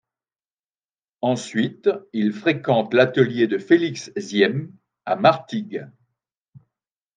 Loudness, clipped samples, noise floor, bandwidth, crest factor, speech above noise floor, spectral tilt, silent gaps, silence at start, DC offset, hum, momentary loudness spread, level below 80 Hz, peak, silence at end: -21 LUFS; under 0.1%; under -90 dBFS; 9.4 kHz; 20 dB; over 70 dB; -6 dB/octave; 6.37-6.52 s; 1.25 s; under 0.1%; none; 13 LU; -72 dBFS; -2 dBFS; 0.6 s